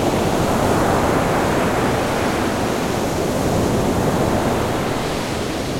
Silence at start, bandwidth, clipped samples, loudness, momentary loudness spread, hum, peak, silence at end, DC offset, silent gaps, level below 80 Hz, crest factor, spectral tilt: 0 s; 16.5 kHz; under 0.1%; -19 LUFS; 4 LU; none; -4 dBFS; 0 s; under 0.1%; none; -34 dBFS; 14 dB; -5.5 dB/octave